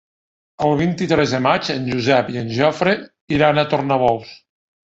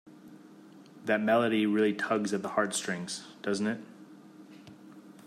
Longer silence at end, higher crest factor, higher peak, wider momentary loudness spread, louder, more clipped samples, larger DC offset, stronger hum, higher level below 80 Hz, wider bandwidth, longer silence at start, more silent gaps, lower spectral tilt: first, 0.5 s vs 0.05 s; about the same, 18 dB vs 18 dB; first, 0 dBFS vs -14 dBFS; second, 6 LU vs 25 LU; first, -18 LUFS vs -30 LUFS; neither; neither; neither; first, -50 dBFS vs -82 dBFS; second, 8 kHz vs 15 kHz; first, 0.6 s vs 0.05 s; first, 3.21-3.28 s vs none; first, -6 dB/octave vs -4.5 dB/octave